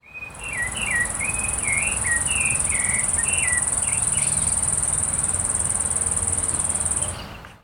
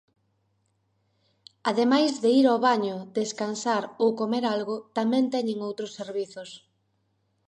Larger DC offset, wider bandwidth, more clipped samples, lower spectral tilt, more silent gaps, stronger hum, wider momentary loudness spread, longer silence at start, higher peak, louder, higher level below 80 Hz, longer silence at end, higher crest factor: neither; first, 19 kHz vs 10.5 kHz; neither; second, -1 dB/octave vs -4.5 dB/octave; neither; neither; second, 6 LU vs 12 LU; second, 0.05 s vs 1.65 s; about the same, -6 dBFS vs -8 dBFS; first, -20 LUFS vs -25 LUFS; first, -40 dBFS vs -80 dBFS; second, 0.05 s vs 0.9 s; about the same, 18 dB vs 18 dB